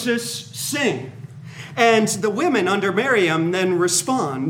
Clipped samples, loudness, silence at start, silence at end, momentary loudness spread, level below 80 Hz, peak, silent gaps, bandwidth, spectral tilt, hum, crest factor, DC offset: under 0.1%; -19 LUFS; 0 s; 0 s; 15 LU; -68 dBFS; -2 dBFS; none; 17.5 kHz; -3.5 dB/octave; none; 18 dB; under 0.1%